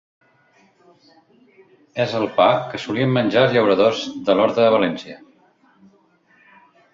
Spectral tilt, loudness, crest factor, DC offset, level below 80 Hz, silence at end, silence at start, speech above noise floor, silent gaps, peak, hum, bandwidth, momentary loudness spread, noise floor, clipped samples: -6.5 dB/octave; -18 LUFS; 18 dB; under 0.1%; -62 dBFS; 1.75 s; 1.95 s; 40 dB; none; -2 dBFS; none; 7.6 kHz; 10 LU; -57 dBFS; under 0.1%